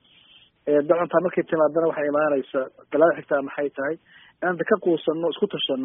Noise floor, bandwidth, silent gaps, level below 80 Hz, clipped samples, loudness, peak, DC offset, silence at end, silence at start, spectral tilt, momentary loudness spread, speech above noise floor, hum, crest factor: -55 dBFS; 3.9 kHz; none; -70 dBFS; under 0.1%; -23 LUFS; -4 dBFS; under 0.1%; 0 s; 0.65 s; -2 dB/octave; 9 LU; 32 dB; none; 18 dB